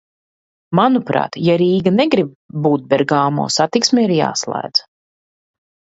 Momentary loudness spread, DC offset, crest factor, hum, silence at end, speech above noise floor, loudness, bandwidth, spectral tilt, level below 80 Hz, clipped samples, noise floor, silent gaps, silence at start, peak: 6 LU; under 0.1%; 16 dB; none; 1.15 s; over 75 dB; -16 LUFS; 8 kHz; -5 dB/octave; -60 dBFS; under 0.1%; under -90 dBFS; 2.35-2.49 s; 0.7 s; 0 dBFS